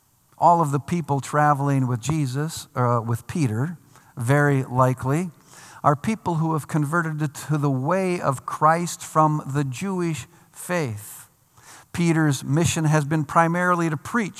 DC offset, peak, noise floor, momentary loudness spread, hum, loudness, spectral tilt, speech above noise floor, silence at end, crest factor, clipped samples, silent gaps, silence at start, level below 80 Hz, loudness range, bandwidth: under 0.1%; -4 dBFS; -51 dBFS; 9 LU; none; -22 LUFS; -6 dB/octave; 29 dB; 0 s; 20 dB; under 0.1%; none; 0.4 s; -60 dBFS; 3 LU; 15 kHz